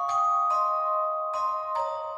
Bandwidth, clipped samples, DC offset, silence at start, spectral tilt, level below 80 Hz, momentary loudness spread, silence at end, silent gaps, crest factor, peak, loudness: 9.2 kHz; under 0.1%; under 0.1%; 0 s; -1.5 dB/octave; -76 dBFS; 6 LU; 0 s; none; 10 dB; -16 dBFS; -26 LUFS